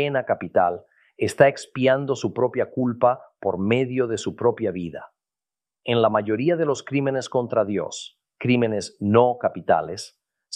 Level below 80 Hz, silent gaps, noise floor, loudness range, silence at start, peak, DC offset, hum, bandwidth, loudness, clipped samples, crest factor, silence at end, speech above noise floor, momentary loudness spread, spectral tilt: -64 dBFS; none; under -90 dBFS; 2 LU; 0 s; -2 dBFS; under 0.1%; none; 12.5 kHz; -23 LUFS; under 0.1%; 20 dB; 0 s; over 68 dB; 13 LU; -6 dB/octave